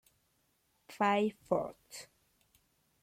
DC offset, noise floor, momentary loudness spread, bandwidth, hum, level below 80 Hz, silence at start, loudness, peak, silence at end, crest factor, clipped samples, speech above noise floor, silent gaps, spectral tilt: under 0.1%; -76 dBFS; 19 LU; 16 kHz; none; -74 dBFS; 0.9 s; -33 LUFS; -16 dBFS; 1 s; 22 dB; under 0.1%; 42 dB; none; -5 dB/octave